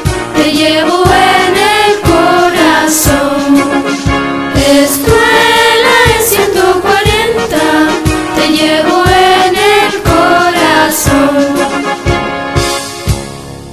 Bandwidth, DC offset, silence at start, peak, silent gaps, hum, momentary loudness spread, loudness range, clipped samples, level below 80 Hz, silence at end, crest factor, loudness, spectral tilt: 16 kHz; under 0.1%; 0 s; 0 dBFS; none; none; 7 LU; 2 LU; 0.8%; -26 dBFS; 0 s; 8 dB; -8 LUFS; -4 dB/octave